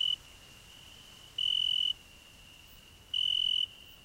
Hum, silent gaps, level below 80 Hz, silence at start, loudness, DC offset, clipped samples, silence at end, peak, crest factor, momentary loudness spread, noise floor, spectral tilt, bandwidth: none; none; -64 dBFS; 0 s; -30 LUFS; under 0.1%; under 0.1%; 0.1 s; -22 dBFS; 14 dB; 24 LU; -55 dBFS; 0 dB/octave; 16 kHz